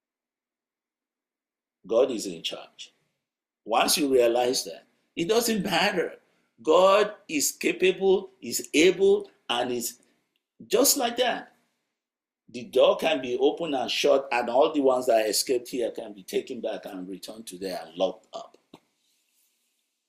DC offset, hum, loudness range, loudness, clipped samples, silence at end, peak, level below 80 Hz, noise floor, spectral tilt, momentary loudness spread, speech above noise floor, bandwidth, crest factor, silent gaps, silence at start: under 0.1%; none; 9 LU; -25 LUFS; under 0.1%; 1.3 s; -8 dBFS; -68 dBFS; under -90 dBFS; -2.5 dB/octave; 17 LU; over 65 dB; 16 kHz; 20 dB; none; 1.85 s